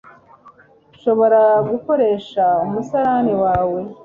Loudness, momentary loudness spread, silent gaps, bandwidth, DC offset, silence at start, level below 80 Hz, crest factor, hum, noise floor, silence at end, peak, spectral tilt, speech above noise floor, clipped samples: -17 LUFS; 7 LU; none; 7 kHz; under 0.1%; 0.45 s; -48 dBFS; 14 dB; none; -50 dBFS; 0.1 s; -4 dBFS; -8 dB/octave; 34 dB; under 0.1%